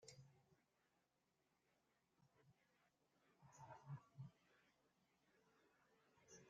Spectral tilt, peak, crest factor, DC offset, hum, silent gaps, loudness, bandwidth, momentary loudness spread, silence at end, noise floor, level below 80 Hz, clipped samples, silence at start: -6 dB/octave; -46 dBFS; 22 dB; under 0.1%; none; none; -63 LUFS; 7.2 kHz; 9 LU; 0 s; -88 dBFS; under -90 dBFS; under 0.1%; 0 s